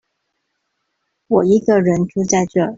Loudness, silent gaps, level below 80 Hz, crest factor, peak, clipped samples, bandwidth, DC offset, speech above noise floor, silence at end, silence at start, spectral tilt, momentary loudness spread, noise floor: -16 LUFS; none; -54 dBFS; 14 dB; -4 dBFS; under 0.1%; 7.8 kHz; under 0.1%; 58 dB; 0 s; 1.3 s; -6 dB/octave; 5 LU; -72 dBFS